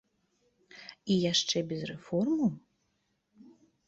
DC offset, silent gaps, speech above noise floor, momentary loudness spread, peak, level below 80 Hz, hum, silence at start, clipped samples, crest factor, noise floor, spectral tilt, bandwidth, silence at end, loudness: under 0.1%; none; 47 dB; 22 LU; -14 dBFS; -70 dBFS; none; 0.75 s; under 0.1%; 18 dB; -77 dBFS; -4.5 dB/octave; 8 kHz; 1.3 s; -30 LUFS